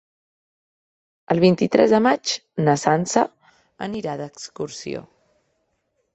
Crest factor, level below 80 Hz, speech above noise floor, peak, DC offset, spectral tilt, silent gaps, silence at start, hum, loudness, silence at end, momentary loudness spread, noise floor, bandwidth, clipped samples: 20 dB; -62 dBFS; 52 dB; -2 dBFS; under 0.1%; -5 dB/octave; none; 1.3 s; none; -20 LUFS; 1.15 s; 16 LU; -71 dBFS; 8.4 kHz; under 0.1%